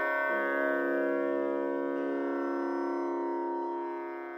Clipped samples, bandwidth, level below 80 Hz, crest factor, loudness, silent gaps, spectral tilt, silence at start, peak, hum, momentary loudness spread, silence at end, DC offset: under 0.1%; 14 kHz; -86 dBFS; 14 dB; -32 LUFS; none; -6.5 dB/octave; 0 s; -18 dBFS; none; 5 LU; 0 s; under 0.1%